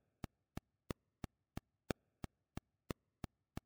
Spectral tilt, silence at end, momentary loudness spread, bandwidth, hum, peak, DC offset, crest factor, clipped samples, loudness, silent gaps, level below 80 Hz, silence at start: -6 dB/octave; 1.75 s; 8 LU; over 20 kHz; none; -22 dBFS; under 0.1%; 30 dB; under 0.1%; -53 LUFS; none; -62 dBFS; 1.9 s